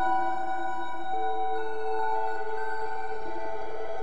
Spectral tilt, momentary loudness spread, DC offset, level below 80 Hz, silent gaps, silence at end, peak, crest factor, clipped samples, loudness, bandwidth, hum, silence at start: -5.5 dB/octave; 7 LU; 5%; -62 dBFS; none; 0 s; -14 dBFS; 14 dB; under 0.1%; -32 LUFS; 11 kHz; none; 0 s